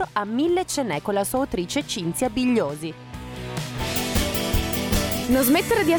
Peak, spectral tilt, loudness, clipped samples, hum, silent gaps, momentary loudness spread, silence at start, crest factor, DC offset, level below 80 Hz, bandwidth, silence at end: -10 dBFS; -4.5 dB/octave; -23 LUFS; under 0.1%; none; none; 12 LU; 0 s; 14 dB; under 0.1%; -36 dBFS; over 20 kHz; 0 s